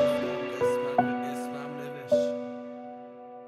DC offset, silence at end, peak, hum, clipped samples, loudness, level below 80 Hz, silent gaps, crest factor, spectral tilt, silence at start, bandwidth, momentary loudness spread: under 0.1%; 0 s; -10 dBFS; none; under 0.1%; -30 LUFS; -72 dBFS; none; 20 dB; -5.5 dB/octave; 0 s; 14.5 kHz; 16 LU